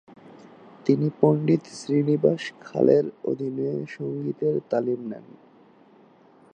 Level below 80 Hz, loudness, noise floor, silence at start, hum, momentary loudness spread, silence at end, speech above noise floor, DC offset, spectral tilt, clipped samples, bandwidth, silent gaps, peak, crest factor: -74 dBFS; -24 LUFS; -55 dBFS; 0.25 s; none; 11 LU; 1.35 s; 31 dB; under 0.1%; -8 dB/octave; under 0.1%; 9.6 kHz; none; -4 dBFS; 22 dB